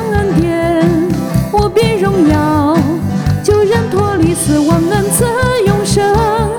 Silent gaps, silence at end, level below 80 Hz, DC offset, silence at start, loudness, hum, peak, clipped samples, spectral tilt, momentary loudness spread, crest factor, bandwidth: none; 0 s; -28 dBFS; under 0.1%; 0 s; -12 LUFS; none; 0 dBFS; under 0.1%; -6 dB/octave; 3 LU; 12 dB; over 20 kHz